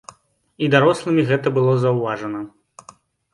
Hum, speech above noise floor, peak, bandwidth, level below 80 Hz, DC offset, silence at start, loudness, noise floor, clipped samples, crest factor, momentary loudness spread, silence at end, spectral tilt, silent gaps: none; 31 dB; 0 dBFS; 11.5 kHz; -62 dBFS; under 0.1%; 0.6 s; -18 LUFS; -49 dBFS; under 0.1%; 20 dB; 13 LU; 0.85 s; -7 dB/octave; none